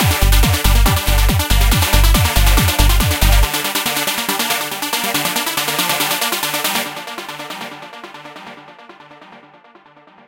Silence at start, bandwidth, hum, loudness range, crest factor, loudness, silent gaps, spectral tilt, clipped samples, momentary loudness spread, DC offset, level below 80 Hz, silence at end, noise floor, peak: 0 s; 17.5 kHz; none; 11 LU; 16 dB; -15 LUFS; none; -3 dB/octave; under 0.1%; 16 LU; under 0.1%; -18 dBFS; 0.9 s; -46 dBFS; 0 dBFS